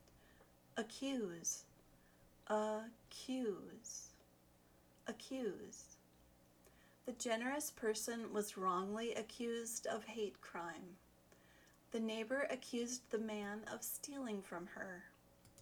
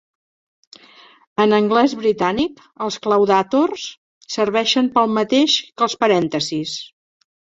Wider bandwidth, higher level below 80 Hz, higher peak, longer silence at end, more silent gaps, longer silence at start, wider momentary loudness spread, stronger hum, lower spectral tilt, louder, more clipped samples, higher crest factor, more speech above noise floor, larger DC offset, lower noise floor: first, over 20 kHz vs 7.8 kHz; second, -78 dBFS vs -58 dBFS; second, -26 dBFS vs -2 dBFS; second, 0 s vs 0.7 s; second, none vs 3.97-4.21 s; second, 0 s vs 1.4 s; about the same, 14 LU vs 13 LU; neither; about the same, -3 dB/octave vs -4 dB/octave; second, -45 LUFS vs -18 LUFS; neither; about the same, 20 dB vs 18 dB; second, 26 dB vs 30 dB; neither; first, -70 dBFS vs -48 dBFS